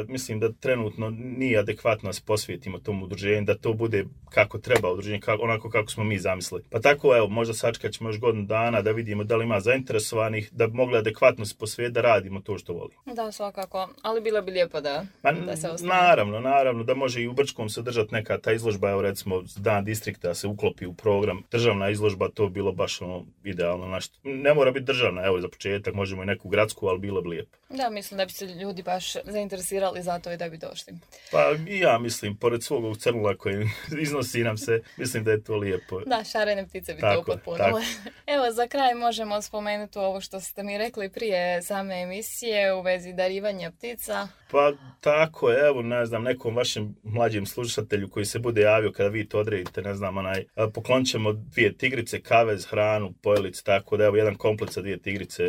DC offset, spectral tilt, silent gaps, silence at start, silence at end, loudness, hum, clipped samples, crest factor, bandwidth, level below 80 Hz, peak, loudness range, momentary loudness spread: under 0.1%; -5 dB/octave; none; 0 s; 0 s; -26 LUFS; none; under 0.1%; 22 dB; 17 kHz; -58 dBFS; -4 dBFS; 4 LU; 10 LU